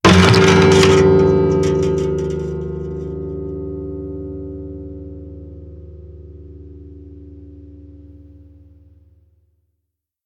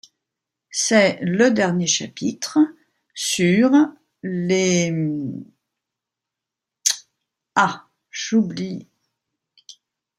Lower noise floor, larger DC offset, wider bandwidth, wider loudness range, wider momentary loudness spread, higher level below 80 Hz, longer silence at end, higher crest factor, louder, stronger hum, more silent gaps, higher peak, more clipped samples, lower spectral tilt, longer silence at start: second, -76 dBFS vs -85 dBFS; neither; second, 12.5 kHz vs 15.5 kHz; first, 26 LU vs 6 LU; first, 28 LU vs 15 LU; first, -36 dBFS vs -66 dBFS; first, 2.15 s vs 0.45 s; about the same, 18 dB vs 20 dB; first, -15 LUFS vs -20 LUFS; neither; neither; about the same, 0 dBFS vs -2 dBFS; neither; first, -5.5 dB/octave vs -4 dB/octave; second, 0.05 s vs 0.75 s